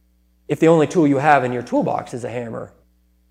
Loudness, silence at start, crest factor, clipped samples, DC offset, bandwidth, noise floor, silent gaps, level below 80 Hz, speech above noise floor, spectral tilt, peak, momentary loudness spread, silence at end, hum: -18 LUFS; 0.5 s; 18 dB; under 0.1%; under 0.1%; 12.5 kHz; -58 dBFS; none; -58 dBFS; 41 dB; -7 dB/octave; 0 dBFS; 14 LU; 0.65 s; none